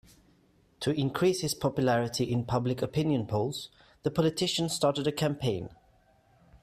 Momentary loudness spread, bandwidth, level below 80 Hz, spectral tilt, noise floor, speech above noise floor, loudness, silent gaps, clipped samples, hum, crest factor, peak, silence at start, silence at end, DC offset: 8 LU; 15 kHz; -58 dBFS; -5.5 dB/octave; -64 dBFS; 36 dB; -29 LUFS; none; under 0.1%; none; 18 dB; -12 dBFS; 0.8 s; 0.05 s; under 0.1%